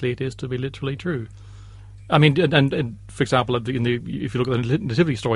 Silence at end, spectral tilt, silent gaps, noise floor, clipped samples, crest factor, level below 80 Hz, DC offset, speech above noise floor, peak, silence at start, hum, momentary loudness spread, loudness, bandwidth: 0 s; -7 dB/octave; none; -41 dBFS; under 0.1%; 20 dB; -46 dBFS; under 0.1%; 20 dB; 0 dBFS; 0 s; none; 11 LU; -22 LUFS; 11.5 kHz